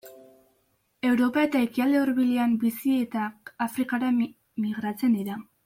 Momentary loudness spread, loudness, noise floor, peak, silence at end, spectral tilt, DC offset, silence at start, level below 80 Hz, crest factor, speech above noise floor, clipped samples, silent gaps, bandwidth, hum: 9 LU; -26 LUFS; -70 dBFS; -10 dBFS; 0.25 s; -6 dB/octave; under 0.1%; 0.05 s; -70 dBFS; 16 dB; 45 dB; under 0.1%; none; 16.5 kHz; none